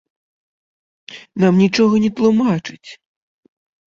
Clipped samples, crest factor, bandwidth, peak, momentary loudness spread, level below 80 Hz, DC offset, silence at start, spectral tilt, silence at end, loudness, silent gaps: under 0.1%; 16 dB; 7.6 kHz; -2 dBFS; 20 LU; -56 dBFS; under 0.1%; 1.1 s; -7 dB/octave; 0.95 s; -15 LUFS; none